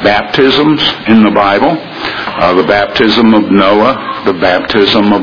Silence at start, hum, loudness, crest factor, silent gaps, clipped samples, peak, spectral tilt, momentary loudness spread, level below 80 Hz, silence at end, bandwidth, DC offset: 0 s; none; -9 LUFS; 8 dB; none; 1%; 0 dBFS; -6.5 dB/octave; 7 LU; -40 dBFS; 0 s; 5.4 kHz; 0.5%